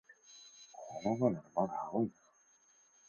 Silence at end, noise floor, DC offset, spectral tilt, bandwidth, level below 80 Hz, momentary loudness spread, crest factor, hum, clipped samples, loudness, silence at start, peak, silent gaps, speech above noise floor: 1 s; -69 dBFS; under 0.1%; -7.5 dB/octave; 7 kHz; -76 dBFS; 21 LU; 22 dB; none; under 0.1%; -37 LUFS; 0.1 s; -18 dBFS; none; 34 dB